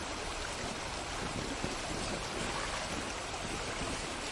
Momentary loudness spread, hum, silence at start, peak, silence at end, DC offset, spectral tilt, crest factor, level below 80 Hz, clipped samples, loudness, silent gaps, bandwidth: 2 LU; none; 0 s; -20 dBFS; 0 s; under 0.1%; -3 dB/octave; 18 dB; -48 dBFS; under 0.1%; -37 LUFS; none; 11.5 kHz